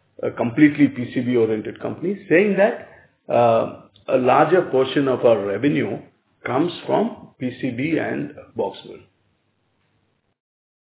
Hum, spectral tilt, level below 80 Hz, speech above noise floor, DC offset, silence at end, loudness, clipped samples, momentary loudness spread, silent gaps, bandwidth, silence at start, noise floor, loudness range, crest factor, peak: none; -10.5 dB/octave; -62 dBFS; 48 dB; under 0.1%; 1.85 s; -20 LUFS; under 0.1%; 14 LU; none; 4 kHz; 0.2 s; -67 dBFS; 9 LU; 20 dB; -2 dBFS